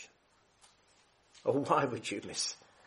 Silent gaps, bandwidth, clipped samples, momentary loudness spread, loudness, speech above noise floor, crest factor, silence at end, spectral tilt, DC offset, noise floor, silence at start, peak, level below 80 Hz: none; 11.5 kHz; under 0.1%; 8 LU; -34 LUFS; 36 dB; 24 dB; 0.3 s; -3.5 dB/octave; under 0.1%; -69 dBFS; 0 s; -12 dBFS; -78 dBFS